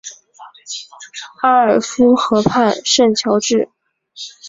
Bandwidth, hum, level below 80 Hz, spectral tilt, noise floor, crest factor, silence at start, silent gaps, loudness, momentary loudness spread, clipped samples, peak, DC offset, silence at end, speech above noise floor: 7.8 kHz; none; -52 dBFS; -3.5 dB/octave; -42 dBFS; 14 dB; 0.05 s; none; -14 LUFS; 19 LU; under 0.1%; -2 dBFS; under 0.1%; 0 s; 27 dB